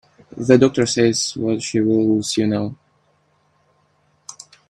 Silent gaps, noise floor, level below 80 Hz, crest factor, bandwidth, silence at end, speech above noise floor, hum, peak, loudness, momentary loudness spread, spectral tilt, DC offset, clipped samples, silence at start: none; -62 dBFS; -58 dBFS; 20 dB; 12.5 kHz; 0.4 s; 44 dB; none; 0 dBFS; -18 LUFS; 17 LU; -5 dB/octave; under 0.1%; under 0.1%; 0.35 s